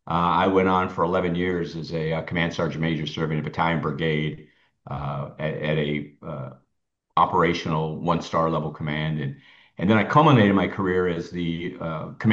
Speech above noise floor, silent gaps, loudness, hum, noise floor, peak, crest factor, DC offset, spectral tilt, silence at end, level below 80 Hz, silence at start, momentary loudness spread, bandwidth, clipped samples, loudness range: 54 dB; none; -24 LUFS; none; -77 dBFS; -4 dBFS; 20 dB; under 0.1%; -7.5 dB/octave; 0 s; -52 dBFS; 0.05 s; 12 LU; 7.4 kHz; under 0.1%; 6 LU